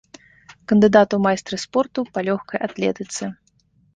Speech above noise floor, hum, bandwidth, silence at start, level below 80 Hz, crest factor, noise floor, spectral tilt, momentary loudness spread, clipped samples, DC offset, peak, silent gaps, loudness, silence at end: 41 dB; none; 9.6 kHz; 0.7 s; -60 dBFS; 20 dB; -60 dBFS; -5.5 dB/octave; 14 LU; under 0.1%; under 0.1%; -2 dBFS; none; -20 LUFS; 0.65 s